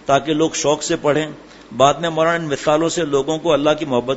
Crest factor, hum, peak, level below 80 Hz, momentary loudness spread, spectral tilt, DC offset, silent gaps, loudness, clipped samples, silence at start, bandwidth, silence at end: 18 dB; none; 0 dBFS; -48 dBFS; 4 LU; -4 dB/octave; under 0.1%; none; -17 LUFS; under 0.1%; 0.05 s; 8 kHz; 0 s